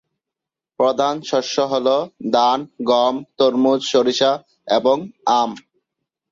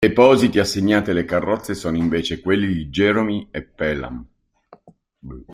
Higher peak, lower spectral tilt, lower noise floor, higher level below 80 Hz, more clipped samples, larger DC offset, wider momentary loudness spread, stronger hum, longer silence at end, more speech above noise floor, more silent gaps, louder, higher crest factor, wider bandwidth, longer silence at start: about the same, -2 dBFS vs -2 dBFS; second, -4 dB/octave vs -5.5 dB/octave; first, -86 dBFS vs -52 dBFS; second, -66 dBFS vs -44 dBFS; neither; neither; second, 5 LU vs 18 LU; neither; first, 0.7 s vs 0 s; first, 68 dB vs 33 dB; neither; about the same, -18 LUFS vs -19 LUFS; about the same, 16 dB vs 18 dB; second, 7.6 kHz vs 15.5 kHz; first, 0.8 s vs 0 s